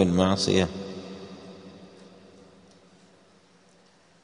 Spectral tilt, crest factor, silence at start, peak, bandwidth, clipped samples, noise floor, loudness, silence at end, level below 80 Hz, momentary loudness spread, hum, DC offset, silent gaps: -5.5 dB/octave; 24 dB; 0 s; -6 dBFS; 10 kHz; under 0.1%; -59 dBFS; -25 LUFS; 2.35 s; -58 dBFS; 27 LU; none; under 0.1%; none